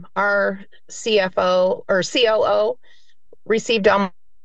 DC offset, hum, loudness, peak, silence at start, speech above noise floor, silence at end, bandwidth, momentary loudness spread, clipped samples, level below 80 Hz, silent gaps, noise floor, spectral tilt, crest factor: 1%; none; -19 LUFS; -2 dBFS; 0 s; 34 dB; 0.35 s; 8.8 kHz; 11 LU; under 0.1%; -56 dBFS; none; -52 dBFS; -3.5 dB/octave; 18 dB